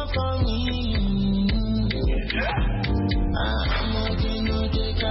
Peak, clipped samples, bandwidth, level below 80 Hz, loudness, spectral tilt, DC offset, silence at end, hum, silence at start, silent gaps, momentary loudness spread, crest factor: -10 dBFS; under 0.1%; 5.8 kHz; -26 dBFS; -25 LUFS; -10 dB/octave; under 0.1%; 0 s; none; 0 s; none; 2 LU; 12 dB